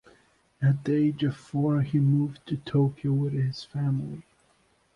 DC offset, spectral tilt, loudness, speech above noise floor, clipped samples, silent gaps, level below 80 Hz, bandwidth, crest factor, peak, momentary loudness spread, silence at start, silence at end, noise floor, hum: under 0.1%; -9 dB/octave; -27 LUFS; 40 dB; under 0.1%; none; -62 dBFS; 6.8 kHz; 14 dB; -14 dBFS; 7 LU; 0.6 s; 0.75 s; -66 dBFS; none